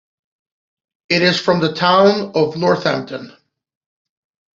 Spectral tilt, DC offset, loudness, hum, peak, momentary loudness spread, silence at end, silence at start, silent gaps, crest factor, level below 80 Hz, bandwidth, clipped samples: -5.5 dB/octave; under 0.1%; -15 LUFS; none; -2 dBFS; 10 LU; 1.25 s; 1.1 s; none; 16 dB; -58 dBFS; 7.6 kHz; under 0.1%